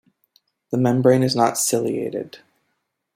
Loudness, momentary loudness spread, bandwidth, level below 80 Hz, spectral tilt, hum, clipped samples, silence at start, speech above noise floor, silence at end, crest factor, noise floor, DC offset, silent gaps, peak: -19 LUFS; 13 LU; 16.5 kHz; -64 dBFS; -5 dB/octave; none; under 0.1%; 0.7 s; 55 dB; 0.8 s; 18 dB; -74 dBFS; under 0.1%; none; -4 dBFS